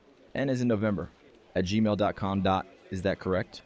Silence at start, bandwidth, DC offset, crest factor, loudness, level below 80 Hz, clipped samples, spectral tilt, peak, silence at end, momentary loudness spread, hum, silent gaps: 0.35 s; 8 kHz; under 0.1%; 14 dB; -29 LUFS; -50 dBFS; under 0.1%; -7 dB/octave; -14 dBFS; 0.05 s; 9 LU; none; none